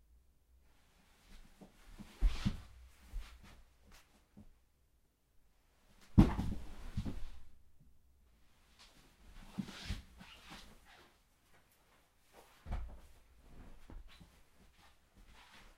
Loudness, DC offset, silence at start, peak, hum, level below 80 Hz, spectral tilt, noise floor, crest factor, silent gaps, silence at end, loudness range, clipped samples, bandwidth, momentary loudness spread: -39 LUFS; under 0.1%; 1.3 s; -12 dBFS; none; -46 dBFS; -7 dB/octave; -74 dBFS; 30 dB; none; 0.15 s; 17 LU; under 0.1%; 15 kHz; 28 LU